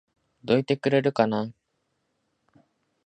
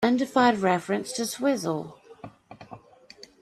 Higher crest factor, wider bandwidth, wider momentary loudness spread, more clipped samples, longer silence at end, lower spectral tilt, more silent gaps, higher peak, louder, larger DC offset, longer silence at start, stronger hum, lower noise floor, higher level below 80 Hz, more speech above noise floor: about the same, 22 dB vs 18 dB; second, 9 kHz vs 13.5 kHz; second, 13 LU vs 25 LU; neither; first, 1.55 s vs 0.65 s; first, -7.5 dB/octave vs -4.5 dB/octave; neither; about the same, -6 dBFS vs -8 dBFS; about the same, -24 LUFS vs -25 LUFS; neither; first, 0.45 s vs 0 s; neither; first, -75 dBFS vs -51 dBFS; about the same, -68 dBFS vs -70 dBFS; first, 52 dB vs 26 dB